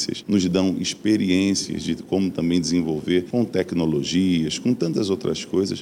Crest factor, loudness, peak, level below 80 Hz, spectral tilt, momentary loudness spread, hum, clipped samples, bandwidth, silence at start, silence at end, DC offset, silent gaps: 14 dB; -22 LUFS; -8 dBFS; -52 dBFS; -5 dB/octave; 4 LU; none; under 0.1%; 15 kHz; 0 s; 0 s; under 0.1%; none